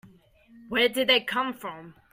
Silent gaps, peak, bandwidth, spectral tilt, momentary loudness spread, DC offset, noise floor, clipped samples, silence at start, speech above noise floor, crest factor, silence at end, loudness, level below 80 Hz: none; -10 dBFS; 16 kHz; -2.5 dB/octave; 17 LU; under 0.1%; -56 dBFS; under 0.1%; 0.05 s; 30 dB; 18 dB; 0.2 s; -24 LUFS; -64 dBFS